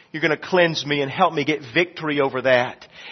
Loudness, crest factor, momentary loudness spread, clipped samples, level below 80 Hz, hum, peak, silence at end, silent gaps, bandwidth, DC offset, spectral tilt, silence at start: -20 LUFS; 18 dB; 5 LU; under 0.1%; -64 dBFS; none; -2 dBFS; 0 s; none; 6.4 kHz; under 0.1%; -5 dB/octave; 0.15 s